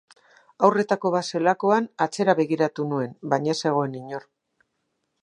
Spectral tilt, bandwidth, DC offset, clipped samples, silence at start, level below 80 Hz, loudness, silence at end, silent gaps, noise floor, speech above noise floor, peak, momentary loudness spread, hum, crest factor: -5.5 dB/octave; 11 kHz; under 0.1%; under 0.1%; 0.6 s; -76 dBFS; -23 LUFS; 1.05 s; none; -76 dBFS; 53 dB; -4 dBFS; 8 LU; none; 22 dB